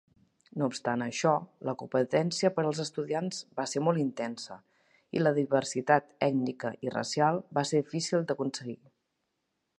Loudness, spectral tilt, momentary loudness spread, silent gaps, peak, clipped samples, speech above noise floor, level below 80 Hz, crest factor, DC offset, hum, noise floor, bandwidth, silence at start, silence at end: -30 LUFS; -5 dB/octave; 10 LU; none; -8 dBFS; under 0.1%; 51 dB; -76 dBFS; 22 dB; under 0.1%; none; -81 dBFS; 11.5 kHz; 0.55 s; 1.05 s